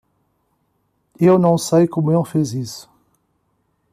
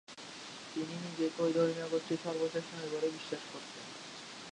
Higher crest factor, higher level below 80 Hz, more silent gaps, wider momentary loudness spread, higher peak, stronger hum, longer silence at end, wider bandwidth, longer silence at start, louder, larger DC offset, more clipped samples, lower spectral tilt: about the same, 16 dB vs 18 dB; first, -60 dBFS vs -82 dBFS; neither; about the same, 15 LU vs 14 LU; first, -4 dBFS vs -18 dBFS; neither; first, 1.1 s vs 0 s; first, 15 kHz vs 11 kHz; first, 1.2 s vs 0.1 s; first, -17 LUFS vs -37 LUFS; neither; neither; first, -7 dB/octave vs -5 dB/octave